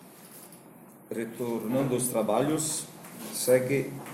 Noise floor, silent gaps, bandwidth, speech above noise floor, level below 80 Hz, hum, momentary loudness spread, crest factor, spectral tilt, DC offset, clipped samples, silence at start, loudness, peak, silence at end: -51 dBFS; none; 16.5 kHz; 23 dB; -66 dBFS; none; 22 LU; 18 dB; -4.5 dB/octave; under 0.1%; under 0.1%; 0 s; -28 LUFS; -10 dBFS; 0 s